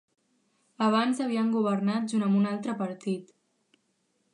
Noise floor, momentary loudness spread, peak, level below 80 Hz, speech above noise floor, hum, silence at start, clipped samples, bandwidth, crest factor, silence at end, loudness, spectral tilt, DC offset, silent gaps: -74 dBFS; 8 LU; -10 dBFS; -80 dBFS; 47 dB; none; 0.8 s; under 0.1%; 11 kHz; 18 dB; 1.1 s; -28 LUFS; -6.5 dB/octave; under 0.1%; none